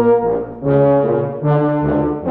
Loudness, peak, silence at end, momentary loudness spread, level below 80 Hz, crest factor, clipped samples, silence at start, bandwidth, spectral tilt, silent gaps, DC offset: -16 LUFS; -4 dBFS; 0 s; 5 LU; -40 dBFS; 12 dB; under 0.1%; 0 s; 4.1 kHz; -12.5 dB/octave; none; under 0.1%